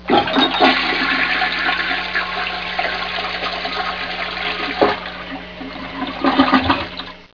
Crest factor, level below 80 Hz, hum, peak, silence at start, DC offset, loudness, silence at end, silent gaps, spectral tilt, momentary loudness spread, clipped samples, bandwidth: 20 dB; -44 dBFS; none; 0 dBFS; 0 s; 0.4%; -18 LUFS; 0.1 s; none; -5 dB/octave; 14 LU; under 0.1%; 5.4 kHz